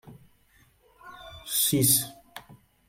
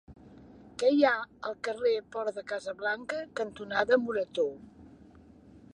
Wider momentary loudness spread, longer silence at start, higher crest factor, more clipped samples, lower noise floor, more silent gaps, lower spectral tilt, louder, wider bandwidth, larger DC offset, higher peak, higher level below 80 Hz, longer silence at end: first, 26 LU vs 11 LU; about the same, 0.05 s vs 0.1 s; about the same, 20 dB vs 20 dB; neither; first, -62 dBFS vs -55 dBFS; neither; second, -3 dB/octave vs -4.5 dB/octave; first, -23 LUFS vs -30 LUFS; first, 16.5 kHz vs 10.5 kHz; neither; about the same, -10 dBFS vs -10 dBFS; first, -60 dBFS vs -66 dBFS; first, 0.5 s vs 0.15 s